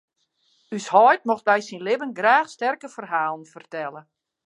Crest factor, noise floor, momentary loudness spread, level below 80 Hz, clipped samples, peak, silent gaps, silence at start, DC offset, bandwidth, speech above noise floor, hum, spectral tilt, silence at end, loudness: 20 dB; -68 dBFS; 17 LU; -82 dBFS; under 0.1%; -2 dBFS; none; 0.7 s; under 0.1%; 11 kHz; 46 dB; none; -4 dB/octave; 0.45 s; -21 LUFS